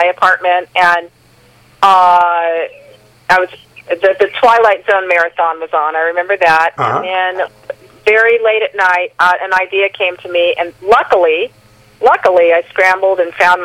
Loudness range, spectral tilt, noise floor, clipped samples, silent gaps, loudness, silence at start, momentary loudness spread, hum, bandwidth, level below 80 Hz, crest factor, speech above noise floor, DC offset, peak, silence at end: 1 LU; -3.5 dB/octave; -46 dBFS; under 0.1%; none; -11 LUFS; 0 s; 8 LU; none; 15 kHz; -54 dBFS; 12 dB; 35 dB; under 0.1%; 0 dBFS; 0 s